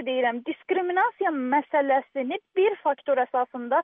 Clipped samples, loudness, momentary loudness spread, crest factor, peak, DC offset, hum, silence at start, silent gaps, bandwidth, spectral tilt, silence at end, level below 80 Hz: under 0.1%; -25 LUFS; 5 LU; 14 dB; -10 dBFS; under 0.1%; none; 0 s; none; 3.8 kHz; -1 dB/octave; 0 s; -86 dBFS